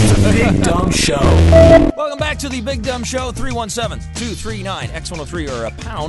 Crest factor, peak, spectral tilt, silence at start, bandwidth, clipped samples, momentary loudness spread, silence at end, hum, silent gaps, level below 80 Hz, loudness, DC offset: 14 dB; 0 dBFS; -5.5 dB/octave; 0 s; 12 kHz; under 0.1%; 16 LU; 0 s; none; none; -22 dBFS; -15 LUFS; under 0.1%